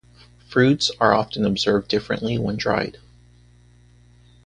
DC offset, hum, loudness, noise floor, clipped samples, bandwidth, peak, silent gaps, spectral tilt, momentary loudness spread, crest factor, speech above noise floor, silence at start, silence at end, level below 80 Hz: under 0.1%; 60 Hz at -40 dBFS; -21 LUFS; -52 dBFS; under 0.1%; 10 kHz; 0 dBFS; none; -5 dB/octave; 7 LU; 22 dB; 32 dB; 0.5 s; 1.55 s; -50 dBFS